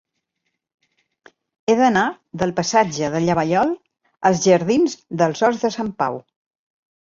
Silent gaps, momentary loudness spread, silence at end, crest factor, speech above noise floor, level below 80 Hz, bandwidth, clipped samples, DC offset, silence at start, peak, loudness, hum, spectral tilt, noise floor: none; 9 LU; 0.85 s; 18 dB; 58 dB; -58 dBFS; 7.8 kHz; under 0.1%; under 0.1%; 1.7 s; -2 dBFS; -19 LUFS; none; -5 dB/octave; -76 dBFS